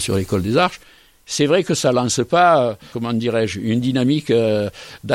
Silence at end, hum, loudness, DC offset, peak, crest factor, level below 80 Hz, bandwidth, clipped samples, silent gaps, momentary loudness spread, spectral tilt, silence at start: 0 s; none; -18 LUFS; under 0.1%; -2 dBFS; 16 dB; -50 dBFS; 16.5 kHz; under 0.1%; none; 9 LU; -5 dB/octave; 0 s